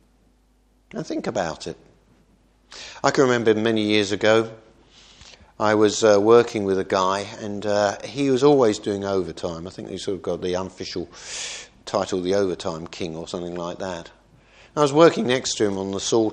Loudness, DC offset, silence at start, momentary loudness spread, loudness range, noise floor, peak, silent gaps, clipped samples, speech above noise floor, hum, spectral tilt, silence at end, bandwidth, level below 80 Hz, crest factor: -22 LUFS; under 0.1%; 0.95 s; 16 LU; 8 LU; -60 dBFS; 0 dBFS; none; under 0.1%; 39 dB; none; -4.5 dB/octave; 0 s; 10 kHz; -58 dBFS; 22 dB